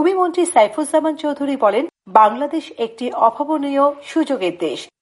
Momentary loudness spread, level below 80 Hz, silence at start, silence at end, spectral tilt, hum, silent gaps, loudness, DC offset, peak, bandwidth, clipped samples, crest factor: 10 LU; -70 dBFS; 0 s; 0.15 s; -3.5 dB/octave; none; none; -18 LUFS; under 0.1%; 0 dBFS; 11.5 kHz; under 0.1%; 16 dB